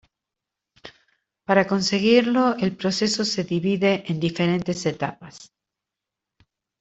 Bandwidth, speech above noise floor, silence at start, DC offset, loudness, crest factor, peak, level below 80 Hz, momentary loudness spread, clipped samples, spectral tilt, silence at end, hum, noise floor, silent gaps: 8.2 kHz; 64 dB; 0.85 s; under 0.1%; -22 LUFS; 20 dB; -4 dBFS; -62 dBFS; 12 LU; under 0.1%; -5 dB/octave; 1.35 s; none; -86 dBFS; none